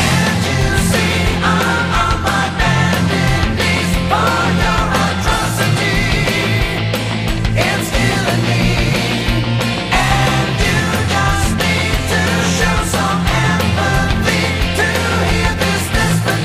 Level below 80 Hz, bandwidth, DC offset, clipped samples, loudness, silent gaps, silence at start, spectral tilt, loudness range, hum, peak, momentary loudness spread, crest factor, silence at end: -24 dBFS; 15.5 kHz; under 0.1%; under 0.1%; -14 LUFS; none; 0 s; -4.5 dB/octave; 1 LU; none; 0 dBFS; 2 LU; 14 dB; 0 s